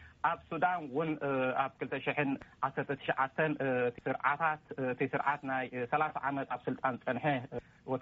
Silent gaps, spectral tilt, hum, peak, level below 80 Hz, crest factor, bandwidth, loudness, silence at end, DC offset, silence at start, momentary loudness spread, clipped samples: none; -4.5 dB/octave; none; -16 dBFS; -70 dBFS; 18 dB; 7.2 kHz; -34 LUFS; 0 s; under 0.1%; 0 s; 5 LU; under 0.1%